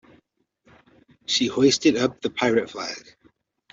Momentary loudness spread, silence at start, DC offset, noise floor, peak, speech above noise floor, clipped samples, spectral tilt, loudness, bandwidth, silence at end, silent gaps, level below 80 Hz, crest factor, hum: 15 LU; 1.3 s; under 0.1%; -66 dBFS; -6 dBFS; 44 dB; under 0.1%; -3.5 dB/octave; -22 LUFS; 8 kHz; 0.75 s; none; -62 dBFS; 18 dB; none